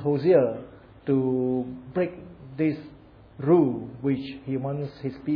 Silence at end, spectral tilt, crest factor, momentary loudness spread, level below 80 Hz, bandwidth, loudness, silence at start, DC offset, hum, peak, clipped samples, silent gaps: 0 s; -11 dB/octave; 18 dB; 15 LU; -58 dBFS; 5.2 kHz; -26 LUFS; 0 s; under 0.1%; none; -8 dBFS; under 0.1%; none